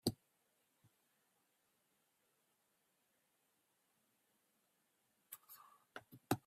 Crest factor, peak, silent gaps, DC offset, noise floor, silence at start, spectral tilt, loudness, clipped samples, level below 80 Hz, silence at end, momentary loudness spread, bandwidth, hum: 32 dB; -22 dBFS; none; under 0.1%; -82 dBFS; 0.05 s; -4.5 dB/octave; -51 LUFS; under 0.1%; -80 dBFS; 0.1 s; 17 LU; 15.5 kHz; none